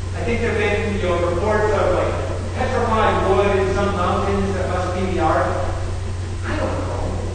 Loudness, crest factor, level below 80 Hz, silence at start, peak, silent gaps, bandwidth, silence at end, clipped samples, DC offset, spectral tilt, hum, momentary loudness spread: -20 LUFS; 14 dB; -30 dBFS; 0 s; -4 dBFS; none; 9.6 kHz; 0 s; under 0.1%; under 0.1%; -6.5 dB/octave; none; 8 LU